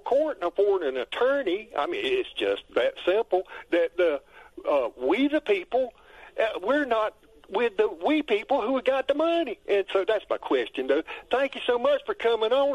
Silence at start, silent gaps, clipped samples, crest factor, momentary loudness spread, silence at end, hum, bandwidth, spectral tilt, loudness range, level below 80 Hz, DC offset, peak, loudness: 0.05 s; none; under 0.1%; 14 dB; 5 LU; 0 s; none; 11.5 kHz; -4.5 dB/octave; 1 LU; -62 dBFS; under 0.1%; -10 dBFS; -26 LUFS